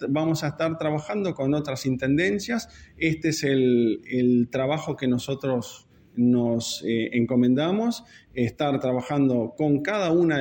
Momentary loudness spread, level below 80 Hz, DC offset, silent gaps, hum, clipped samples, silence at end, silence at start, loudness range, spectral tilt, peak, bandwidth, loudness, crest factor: 7 LU; -58 dBFS; under 0.1%; none; none; under 0.1%; 0 s; 0 s; 1 LU; -6 dB/octave; -8 dBFS; 17 kHz; -24 LUFS; 16 dB